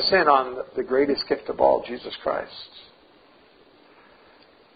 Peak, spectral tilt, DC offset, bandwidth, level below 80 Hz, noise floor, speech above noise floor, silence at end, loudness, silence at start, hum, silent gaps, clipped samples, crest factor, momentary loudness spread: -4 dBFS; -8.5 dB/octave; under 0.1%; 5.2 kHz; -58 dBFS; -55 dBFS; 32 dB; 1.95 s; -23 LUFS; 0 s; none; none; under 0.1%; 22 dB; 17 LU